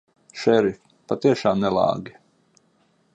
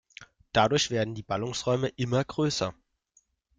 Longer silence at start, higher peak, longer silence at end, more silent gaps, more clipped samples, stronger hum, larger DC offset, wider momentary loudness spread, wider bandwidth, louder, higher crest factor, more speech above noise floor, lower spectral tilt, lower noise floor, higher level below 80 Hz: first, 0.35 s vs 0.2 s; about the same, -6 dBFS vs -8 dBFS; first, 1.05 s vs 0.85 s; neither; neither; neither; neither; first, 21 LU vs 7 LU; second, 8.4 kHz vs 9.4 kHz; first, -22 LUFS vs -28 LUFS; about the same, 18 dB vs 20 dB; about the same, 43 dB vs 41 dB; first, -6.5 dB/octave vs -4.5 dB/octave; second, -63 dBFS vs -68 dBFS; about the same, -58 dBFS vs -58 dBFS